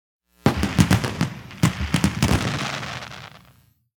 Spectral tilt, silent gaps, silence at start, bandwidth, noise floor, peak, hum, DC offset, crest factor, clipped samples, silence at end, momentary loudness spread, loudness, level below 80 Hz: -5 dB/octave; none; 0.45 s; 19 kHz; -56 dBFS; 0 dBFS; none; under 0.1%; 24 dB; under 0.1%; 0.6 s; 14 LU; -22 LUFS; -36 dBFS